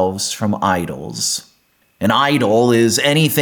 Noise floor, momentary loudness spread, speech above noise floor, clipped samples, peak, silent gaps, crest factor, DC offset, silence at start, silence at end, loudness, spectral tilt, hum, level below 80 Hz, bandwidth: -58 dBFS; 8 LU; 43 dB; under 0.1%; -4 dBFS; none; 14 dB; under 0.1%; 0 s; 0 s; -16 LUFS; -4 dB/octave; none; -54 dBFS; 19 kHz